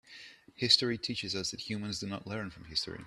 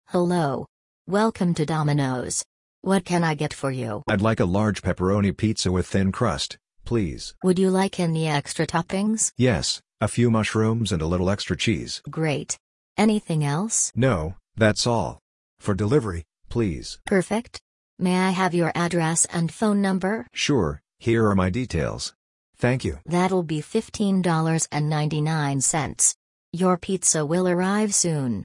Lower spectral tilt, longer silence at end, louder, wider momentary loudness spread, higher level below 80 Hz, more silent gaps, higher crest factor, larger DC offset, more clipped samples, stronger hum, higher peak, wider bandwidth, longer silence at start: second, -3 dB/octave vs -4.5 dB/octave; about the same, 0 s vs 0 s; second, -32 LUFS vs -23 LUFS; first, 19 LU vs 8 LU; second, -64 dBFS vs -48 dBFS; second, none vs 0.69-1.05 s, 2.46-2.82 s, 12.60-12.95 s, 15.21-15.57 s, 17.61-17.97 s, 22.15-22.53 s, 26.15-26.52 s; first, 26 dB vs 18 dB; neither; neither; neither; second, -10 dBFS vs -4 dBFS; first, 13.5 kHz vs 11 kHz; about the same, 0.05 s vs 0.1 s